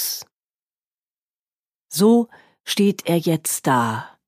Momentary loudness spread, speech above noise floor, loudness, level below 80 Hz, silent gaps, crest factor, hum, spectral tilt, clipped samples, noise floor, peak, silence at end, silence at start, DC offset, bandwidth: 13 LU; over 71 dB; -20 LUFS; -72 dBFS; 0.32-0.40 s, 0.50-0.70 s, 0.83-0.91 s, 0.99-1.30 s, 1.36-1.46 s, 1.52-1.64 s; 18 dB; none; -4.5 dB/octave; under 0.1%; under -90 dBFS; -4 dBFS; 0.2 s; 0 s; under 0.1%; 15.5 kHz